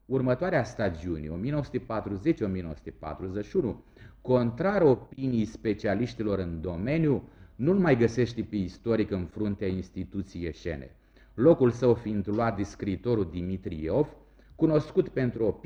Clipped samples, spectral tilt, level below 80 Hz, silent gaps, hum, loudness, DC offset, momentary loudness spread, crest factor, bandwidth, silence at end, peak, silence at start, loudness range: under 0.1%; -8.5 dB/octave; -50 dBFS; none; none; -28 LUFS; under 0.1%; 12 LU; 20 dB; 8.2 kHz; 0.1 s; -8 dBFS; 0.1 s; 4 LU